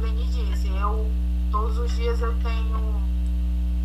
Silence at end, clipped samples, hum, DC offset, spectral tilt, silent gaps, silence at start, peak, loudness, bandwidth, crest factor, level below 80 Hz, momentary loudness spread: 0 s; under 0.1%; 60 Hz at -25 dBFS; under 0.1%; -7.5 dB/octave; none; 0 s; -12 dBFS; -26 LUFS; 8 kHz; 10 dB; -22 dBFS; 1 LU